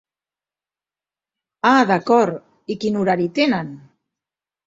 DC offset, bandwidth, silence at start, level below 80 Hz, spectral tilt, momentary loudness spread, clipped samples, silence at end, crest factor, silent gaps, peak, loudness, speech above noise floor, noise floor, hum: under 0.1%; 7.8 kHz; 1.65 s; -62 dBFS; -6 dB/octave; 13 LU; under 0.1%; 0.9 s; 20 dB; none; -2 dBFS; -18 LUFS; over 73 dB; under -90 dBFS; none